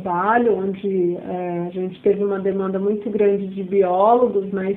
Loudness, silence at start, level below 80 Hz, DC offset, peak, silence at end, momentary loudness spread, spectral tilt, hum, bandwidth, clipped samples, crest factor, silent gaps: -20 LUFS; 0 s; -60 dBFS; under 0.1%; -4 dBFS; 0 s; 10 LU; -10.5 dB/octave; none; 3.9 kHz; under 0.1%; 14 dB; none